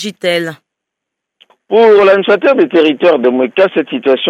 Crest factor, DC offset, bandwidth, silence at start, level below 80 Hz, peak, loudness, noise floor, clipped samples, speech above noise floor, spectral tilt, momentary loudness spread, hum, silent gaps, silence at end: 10 dB; under 0.1%; 13 kHz; 0 s; -60 dBFS; 0 dBFS; -10 LUFS; -78 dBFS; under 0.1%; 68 dB; -5 dB/octave; 8 LU; none; none; 0 s